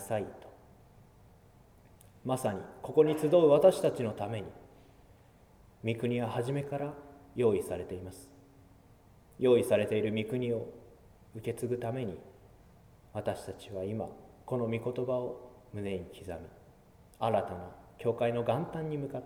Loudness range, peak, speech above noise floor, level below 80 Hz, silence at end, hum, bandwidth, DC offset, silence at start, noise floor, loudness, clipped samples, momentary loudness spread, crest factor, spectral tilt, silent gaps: 10 LU; -10 dBFS; 28 dB; -64 dBFS; 0 s; none; 16.5 kHz; under 0.1%; 0 s; -60 dBFS; -32 LUFS; under 0.1%; 19 LU; 22 dB; -7 dB/octave; none